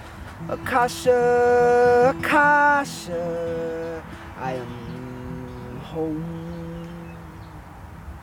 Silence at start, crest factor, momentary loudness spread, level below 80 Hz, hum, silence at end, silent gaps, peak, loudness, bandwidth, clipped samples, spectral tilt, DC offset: 0 s; 16 dB; 23 LU; -46 dBFS; none; 0 s; none; -6 dBFS; -21 LUFS; 16.5 kHz; under 0.1%; -5.5 dB/octave; under 0.1%